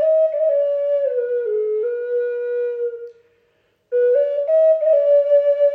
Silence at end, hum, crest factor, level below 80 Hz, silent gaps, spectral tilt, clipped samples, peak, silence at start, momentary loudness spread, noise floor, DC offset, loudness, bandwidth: 0 s; none; 12 dB; -80 dBFS; none; -4.5 dB/octave; under 0.1%; -6 dBFS; 0 s; 9 LU; -63 dBFS; under 0.1%; -18 LUFS; 3.6 kHz